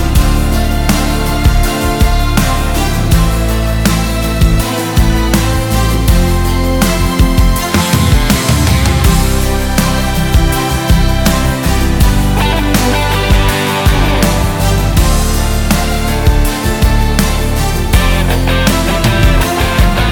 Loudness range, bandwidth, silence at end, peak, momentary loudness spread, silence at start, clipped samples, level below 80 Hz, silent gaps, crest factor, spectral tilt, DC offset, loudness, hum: 1 LU; 17.5 kHz; 0 s; 0 dBFS; 3 LU; 0 s; under 0.1%; -14 dBFS; none; 10 dB; -5 dB/octave; under 0.1%; -12 LUFS; none